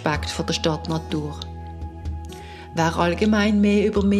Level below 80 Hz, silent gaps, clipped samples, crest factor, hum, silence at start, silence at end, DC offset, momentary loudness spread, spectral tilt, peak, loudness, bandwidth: -38 dBFS; none; under 0.1%; 16 dB; none; 0 s; 0 s; under 0.1%; 17 LU; -6 dB/octave; -6 dBFS; -22 LUFS; 12.5 kHz